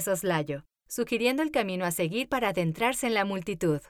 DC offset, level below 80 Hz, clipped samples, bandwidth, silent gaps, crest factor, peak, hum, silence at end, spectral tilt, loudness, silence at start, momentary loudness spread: under 0.1%; -58 dBFS; under 0.1%; 19 kHz; none; 16 dB; -12 dBFS; none; 0.1 s; -4.5 dB/octave; -28 LUFS; 0 s; 7 LU